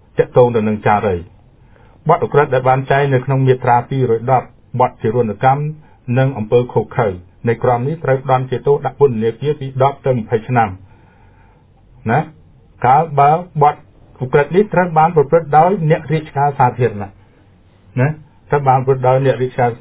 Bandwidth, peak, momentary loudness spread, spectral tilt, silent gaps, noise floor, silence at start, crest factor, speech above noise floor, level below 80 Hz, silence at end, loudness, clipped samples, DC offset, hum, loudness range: 4 kHz; 0 dBFS; 8 LU; -11.5 dB/octave; none; -48 dBFS; 0.15 s; 16 dB; 34 dB; -44 dBFS; 0.05 s; -15 LUFS; under 0.1%; under 0.1%; none; 3 LU